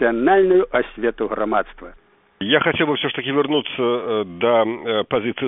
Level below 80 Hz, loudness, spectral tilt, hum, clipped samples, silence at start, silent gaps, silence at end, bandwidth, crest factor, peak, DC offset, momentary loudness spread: -48 dBFS; -19 LUFS; -2.5 dB/octave; none; under 0.1%; 0 s; none; 0 s; 3.9 kHz; 18 dB; 0 dBFS; under 0.1%; 8 LU